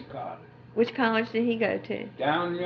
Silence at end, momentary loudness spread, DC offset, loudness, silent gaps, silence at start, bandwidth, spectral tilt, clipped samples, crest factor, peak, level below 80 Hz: 0 s; 13 LU; under 0.1%; -27 LUFS; none; 0 s; 6.2 kHz; -7.5 dB/octave; under 0.1%; 18 dB; -10 dBFS; -68 dBFS